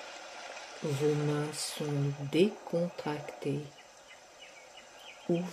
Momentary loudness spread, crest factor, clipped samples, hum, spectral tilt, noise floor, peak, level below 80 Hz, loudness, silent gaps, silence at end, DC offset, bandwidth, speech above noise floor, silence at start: 21 LU; 20 dB; under 0.1%; none; -5.5 dB/octave; -55 dBFS; -14 dBFS; -76 dBFS; -34 LUFS; none; 0 s; under 0.1%; 14.5 kHz; 22 dB; 0 s